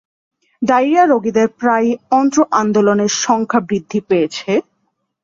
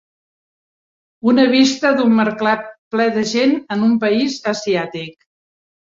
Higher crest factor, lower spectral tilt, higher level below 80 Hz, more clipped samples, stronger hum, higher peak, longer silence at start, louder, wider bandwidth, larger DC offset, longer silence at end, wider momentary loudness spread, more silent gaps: about the same, 14 dB vs 16 dB; about the same, -4.5 dB/octave vs -4.5 dB/octave; about the same, -58 dBFS vs -62 dBFS; neither; neither; about the same, 0 dBFS vs -2 dBFS; second, 0.6 s vs 1.25 s; about the same, -15 LUFS vs -16 LUFS; about the same, 7.6 kHz vs 7.8 kHz; neither; about the same, 0.65 s vs 0.75 s; about the same, 7 LU vs 9 LU; second, none vs 2.78-2.91 s